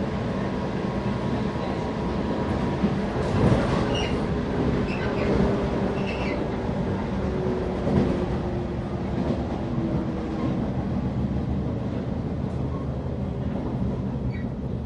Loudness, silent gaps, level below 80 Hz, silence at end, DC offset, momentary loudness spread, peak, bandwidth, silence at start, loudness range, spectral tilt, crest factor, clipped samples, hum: -26 LUFS; none; -36 dBFS; 0 s; under 0.1%; 6 LU; -8 dBFS; 10.5 kHz; 0 s; 4 LU; -8 dB/octave; 18 dB; under 0.1%; none